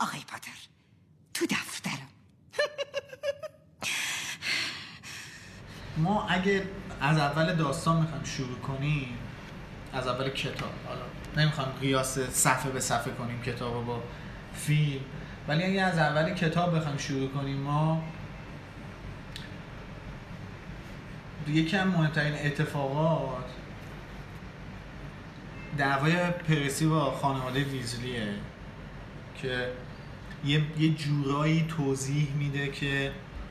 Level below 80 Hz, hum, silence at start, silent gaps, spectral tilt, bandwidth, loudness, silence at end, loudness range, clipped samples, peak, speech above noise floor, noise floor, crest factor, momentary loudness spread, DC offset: -50 dBFS; none; 0 s; none; -5 dB/octave; 13.5 kHz; -30 LUFS; 0 s; 6 LU; under 0.1%; -10 dBFS; 32 dB; -61 dBFS; 20 dB; 17 LU; under 0.1%